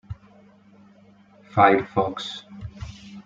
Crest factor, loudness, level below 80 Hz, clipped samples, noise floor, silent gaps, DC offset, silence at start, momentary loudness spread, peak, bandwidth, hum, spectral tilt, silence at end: 22 dB; -21 LUFS; -52 dBFS; under 0.1%; -53 dBFS; none; under 0.1%; 0.1 s; 23 LU; -4 dBFS; 7.8 kHz; none; -6 dB/octave; 0.05 s